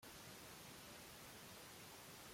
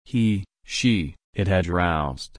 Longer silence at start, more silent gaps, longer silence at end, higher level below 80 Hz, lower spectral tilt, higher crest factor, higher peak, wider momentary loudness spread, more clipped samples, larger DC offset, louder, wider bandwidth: about the same, 0 s vs 0.1 s; second, none vs 1.24-1.33 s; about the same, 0 s vs 0.1 s; second, -78 dBFS vs -40 dBFS; second, -2.5 dB/octave vs -5.5 dB/octave; about the same, 14 dB vs 16 dB; second, -44 dBFS vs -8 dBFS; second, 0 LU vs 8 LU; neither; neither; second, -57 LUFS vs -24 LUFS; first, 16.5 kHz vs 10.5 kHz